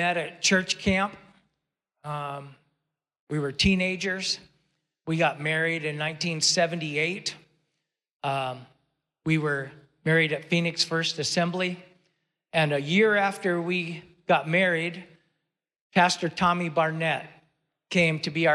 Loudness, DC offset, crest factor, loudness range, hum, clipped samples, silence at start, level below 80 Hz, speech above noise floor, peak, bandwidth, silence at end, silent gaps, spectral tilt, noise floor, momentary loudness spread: -25 LUFS; under 0.1%; 18 dB; 4 LU; none; under 0.1%; 0 s; -54 dBFS; 57 dB; -10 dBFS; 12.5 kHz; 0 s; 3.20-3.27 s, 8.15-8.20 s, 15.81-15.90 s; -4 dB/octave; -82 dBFS; 12 LU